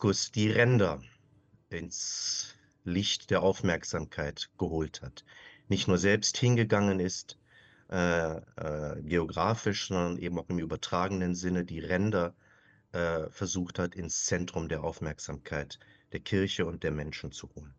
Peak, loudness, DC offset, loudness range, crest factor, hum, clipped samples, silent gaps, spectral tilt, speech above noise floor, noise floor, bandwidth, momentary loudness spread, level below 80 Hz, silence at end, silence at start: -10 dBFS; -31 LUFS; under 0.1%; 4 LU; 20 dB; none; under 0.1%; none; -4.5 dB/octave; 33 dB; -64 dBFS; 8.6 kHz; 14 LU; -54 dBFS; 0.05 s; 0 s